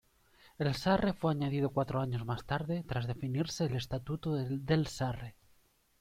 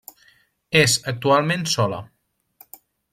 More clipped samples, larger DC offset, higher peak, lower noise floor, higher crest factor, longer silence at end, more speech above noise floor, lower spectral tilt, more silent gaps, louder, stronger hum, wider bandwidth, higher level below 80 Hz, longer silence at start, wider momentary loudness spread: neither; neither; second, -16 dBFS vs -4 dBFS; first, -68 dBFS vs -59 dBFS; about the same, 18 dB vs 20 dB; second, 0.7 s vs 1.05 s; second, 35 dB vs 39 dB; first, -6.5 dB/octave vs -3.5 dB/octave; neither; second, -34 LUFS vs -19 LUFS; neither; about the same, 15.5 kHz vs 16.5 kHz; about the same, -56 dBFS vs -58 dBFS; second, 0.45 s vs 0.7 s; about the same, 7 LU vs 7 LU